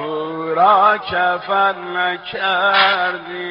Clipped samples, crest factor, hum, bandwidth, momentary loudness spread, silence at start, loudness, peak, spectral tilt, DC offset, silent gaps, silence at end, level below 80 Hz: under 0.1%; 16 dB; none; 5.6 kHz; 9 LU; 0 s; -16 LUFS; -2 dBFS; 0 dB/octave; under 0.1%; none; 0 s; -58 dBFS